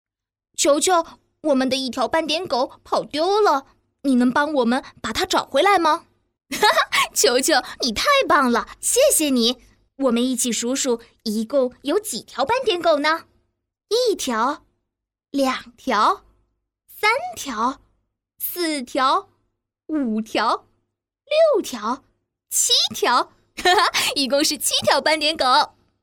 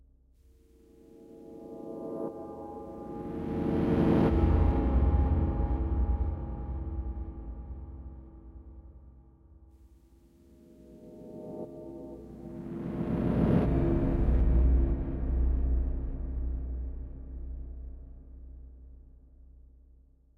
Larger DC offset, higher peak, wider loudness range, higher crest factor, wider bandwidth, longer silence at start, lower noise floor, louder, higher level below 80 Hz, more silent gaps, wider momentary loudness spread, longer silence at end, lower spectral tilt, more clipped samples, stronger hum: neither; first, -4 dBFS vs -12 dBFS; second, 6 LU vs 20 LU; about the same, 18 dB vs 18 dB; first, 19.5 kHz vs 4.2 kHz; second, 0.6 s vs 1.15 s; first, -82 dBFS vs -60 dBFS; first, -20 LUFS vs -31 LUFS; second, -56 dBFS vs -34 dBFS; neither; second, 11 LU vs 24 LU; second, 0.35 s vs 0.8 s; second, -1.5 dB/octave vs -10.5 dB/octave; neither; neither